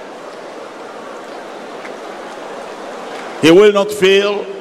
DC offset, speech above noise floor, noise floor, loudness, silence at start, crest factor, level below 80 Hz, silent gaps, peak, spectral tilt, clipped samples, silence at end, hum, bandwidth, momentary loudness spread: 0.1%; 20 dB; -31 dBFS; -11 LUFS; 0 s; 16 dB; -58 dBFS; none; 0 dBFS; -4.5 dB/octave; under 0.1%; 0 s; none; 14.5 kHz; 22 LU